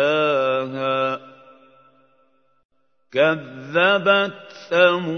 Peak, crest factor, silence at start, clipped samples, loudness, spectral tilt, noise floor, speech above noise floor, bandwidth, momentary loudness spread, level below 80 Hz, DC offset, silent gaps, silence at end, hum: -2 dBFS; 20 dB; 0 s; under 0.1%; -19 LUFS; -5.5 dB/octave; -63 dBFS; 44 dB; 6.6 kHz; 11 LU; -76 dBFS; under 0.1%; 2.65-2.69 s; 0 s; none